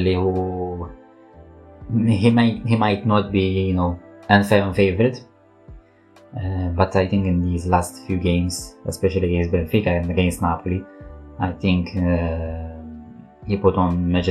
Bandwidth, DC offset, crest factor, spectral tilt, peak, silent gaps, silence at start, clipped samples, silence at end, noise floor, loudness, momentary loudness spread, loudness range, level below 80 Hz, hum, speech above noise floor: 13.5 kHz; under 0.1%; 20 dB; -7 dB/octave; 0 dBFS; none; 0 s; under 0.1%; 0 s; -51 dBFS; -20 LUFS; 15 LU; 4 LU; -38 dBFS; none; 31 dB